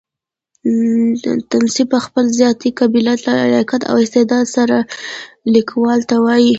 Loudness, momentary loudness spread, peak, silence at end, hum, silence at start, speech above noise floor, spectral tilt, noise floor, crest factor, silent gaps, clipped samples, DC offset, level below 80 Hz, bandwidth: -14 LUFS; 5 LU; 0 dBFS; 0 s; none; 0.65 s; 72 dB; -4.5 dB/octave; -85 dBFS; 14 dB; none; under 0.1%; under 0.1%; -58 dBFS; 8 kHz